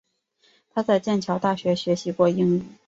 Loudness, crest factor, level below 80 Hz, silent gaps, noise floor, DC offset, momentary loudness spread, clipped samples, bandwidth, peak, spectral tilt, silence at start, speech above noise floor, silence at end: -23 LUFS; 16 dB; -64 dBFS; none; -64 dBFS; under 0.1%; 5 LU; under 0.1%; 7.8 kHz; -8 dBFS; -6.5 dB/octave; 0.75 s; 42 dB; 0.15 s